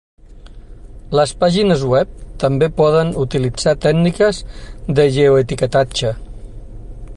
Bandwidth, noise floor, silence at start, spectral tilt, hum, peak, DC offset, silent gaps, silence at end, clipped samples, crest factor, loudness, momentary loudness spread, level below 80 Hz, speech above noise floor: 11.5 kHz; -36 dBFS; 0.3 s; -6 dB/octave; none; -2 dBFS; under 0.1%; none; 0 s; under 0.1%; 14 dB; -15 LUFS; 11 LU; -34 dBFS; 22 dB